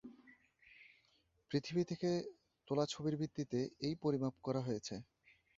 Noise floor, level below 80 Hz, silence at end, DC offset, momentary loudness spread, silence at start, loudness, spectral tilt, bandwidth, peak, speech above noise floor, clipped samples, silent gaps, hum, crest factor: -76 dBFS; -74 dBFS; 0.55 s; under 0.1%; 15 LU; 0.05 s; -40 LUFS; -6.5 dB/octave; 7.6 kHz; -22 dBFS; 37 dB; under 0.1%; none; none; 20 dB